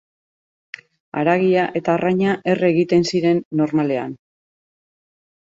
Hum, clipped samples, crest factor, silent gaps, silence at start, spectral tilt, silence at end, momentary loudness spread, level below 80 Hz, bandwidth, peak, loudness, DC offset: none; under 0.1%; 18 dB; 3.45-3.51 s; 1.15 s; -6.5 dB/octave; 1.3 s; 18 LU; -60 dBFS; 7.8 kHz; -2 dBFS; -18 LUFS; under 0.1%